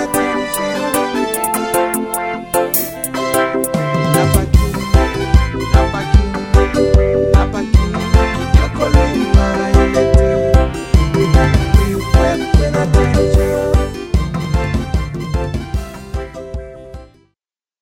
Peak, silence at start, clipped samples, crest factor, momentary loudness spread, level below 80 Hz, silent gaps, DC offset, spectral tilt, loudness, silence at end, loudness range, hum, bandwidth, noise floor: 0 dBFS; 0 s; under 0.1%; 14 dB; 8 LU; -18 dBFS; none; under 0.1%; -6 dB/octave; -15 LUFS; 0.75 s; 5 LU; none; 17.5 kHz; -77 dBFS